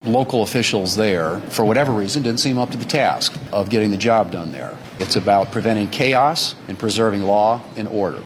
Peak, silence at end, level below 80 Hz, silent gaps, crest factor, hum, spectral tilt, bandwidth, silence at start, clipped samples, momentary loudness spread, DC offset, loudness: -4 dBFS; 0 s; -54 dBFS; none; 14 dB; none; -4.5 dB/octave; 16.5 kHz; 0.05 s; under 0.1%; 8 LU; under 0.1%; -18 LUFS